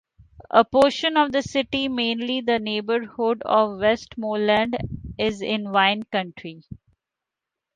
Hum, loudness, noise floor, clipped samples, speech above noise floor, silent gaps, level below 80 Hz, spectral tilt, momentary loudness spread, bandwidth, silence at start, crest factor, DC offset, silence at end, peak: none; -22 LUFS; -86 dBFS; under 0.1%; 64 dB; none; -52 dBFS; -5 dB/octave; 9 LU; 11 kHz; 0.4 s; 22 dB; under 0.1%; 1 s; 0 dBFS